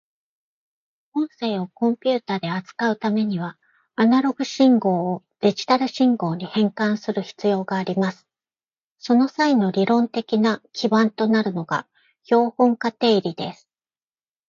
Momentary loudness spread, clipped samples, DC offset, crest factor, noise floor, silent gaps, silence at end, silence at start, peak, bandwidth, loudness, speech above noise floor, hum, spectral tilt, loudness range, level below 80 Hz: 9 LU; under 0.1%; under 0.1%; 16 dB; under -90 dBFS; 8.84-8.96 s; 0.95 s; 1.15 s; -4 dBFS; 7.4 kHz; -21 LUFS; over 70 dB; none; -6.5 dB/octave; 4 LU; -70 dBFS